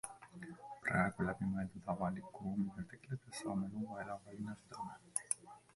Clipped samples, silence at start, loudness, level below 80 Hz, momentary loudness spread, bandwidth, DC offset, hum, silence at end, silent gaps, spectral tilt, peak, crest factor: under 0.1%; 0.05 s; -42 LUFS; -66 dBFS; 13 LU; 11.5 kHz; under 0.1%; none; 0.15 s; none; -5.5 dB/octave; -16 dBFS; 26 dB